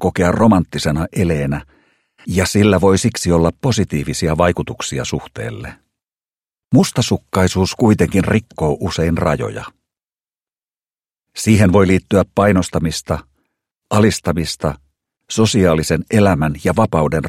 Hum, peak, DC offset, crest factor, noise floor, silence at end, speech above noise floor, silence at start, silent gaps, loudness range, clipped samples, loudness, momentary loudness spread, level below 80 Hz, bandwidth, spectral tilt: none; 0 dBFS; under 0.1%; 16 dB; under -90 dBFS; 0 s; over 75 dB; 0 s; 10.42-10.46 s; 4 LU; under 0.1%; -16 LUFS; 11 LU; -36 dBFS; 15.5 kHz; -6 dB/octave